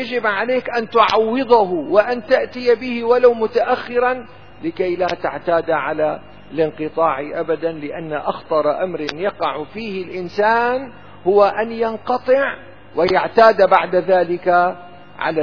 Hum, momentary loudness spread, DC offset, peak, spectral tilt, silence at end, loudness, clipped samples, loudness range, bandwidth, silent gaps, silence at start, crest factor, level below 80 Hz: none; 12 LU; 0.8%; 0 dBFS; -6 dB/octave; 0 s; -18 LUFS; under 0.1%; 5 LU; 5.4 kHz; none; 0 s; 18 dB; -54 dBFS